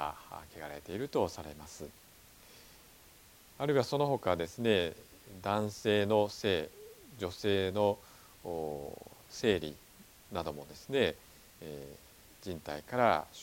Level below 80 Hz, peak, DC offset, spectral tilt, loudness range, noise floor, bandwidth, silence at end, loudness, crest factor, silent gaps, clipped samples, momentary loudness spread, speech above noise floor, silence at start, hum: -62 dBFS; -12 dBFS; under 0.1%; -5 dB/octave; 7 LU; -59 dBFS; 17.5 kHz; 0 s; -34 LUFS; 24 dB; none; under 0.1%; 21 LU; 25 dB; 0 s; none